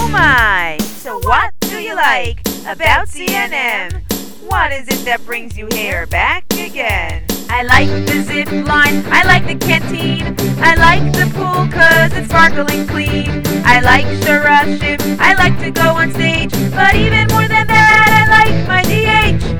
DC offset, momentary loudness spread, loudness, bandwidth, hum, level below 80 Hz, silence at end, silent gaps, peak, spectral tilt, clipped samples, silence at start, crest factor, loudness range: 4%; 11 LU; -12 LUFS; over 20 kHz; none; -28 dBFS; 0 s; none; 0 dBFS; -4.5 dB/octave; 0.3%; 0 s; 12 dB; 7 LU